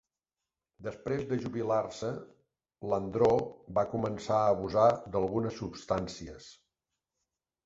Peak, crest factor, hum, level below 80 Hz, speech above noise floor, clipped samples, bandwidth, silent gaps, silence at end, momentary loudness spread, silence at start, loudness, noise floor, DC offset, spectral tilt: -12 dBFS; 20 dB; none; -58 dBFS; over 59 dB; under 0.1%; 8 kHz; none; 1.15 s; 17 LU; 0.8 s; -31 LUFS; under -90 dBFS; under 0.1%; -7 dB/octave